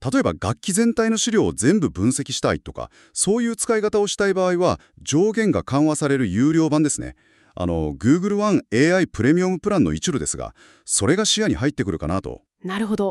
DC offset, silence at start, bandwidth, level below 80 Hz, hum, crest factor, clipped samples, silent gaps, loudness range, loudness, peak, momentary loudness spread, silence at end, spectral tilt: under 0.1%; 0 s; 13 kHz; -44 dBFS; none; 16 dB; under 0.1%; none; 2 LU; -20 LUFS; -4 dBFS; 9 LU; 0 s; -4.5 dB/octave